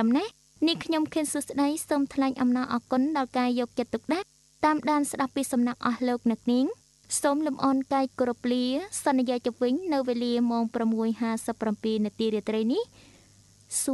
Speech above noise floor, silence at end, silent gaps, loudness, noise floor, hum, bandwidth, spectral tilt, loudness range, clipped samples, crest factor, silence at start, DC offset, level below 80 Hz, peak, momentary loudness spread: 31 dB; 0 s; none; -27 LUFS; -57 dBFS; none; 12 kHz; -4 dB/octave; 1 LU; under 0.1%; 16 dB; 0 s; under 0.1%; -66 dBFS; -10 dBFS; 4 LU